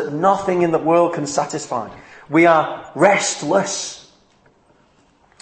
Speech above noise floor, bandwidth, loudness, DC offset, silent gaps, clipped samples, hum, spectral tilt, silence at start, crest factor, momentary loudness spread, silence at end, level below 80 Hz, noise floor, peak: 39 dB; 8.8 kHz; -17 LUFS; under 0.1%; none; under 0.1%; none; -4 dB/octave; 0 s; 18 dB; 12 LU; 1.4 s; -62 dBFS; -56 dBFS; 0 dBFS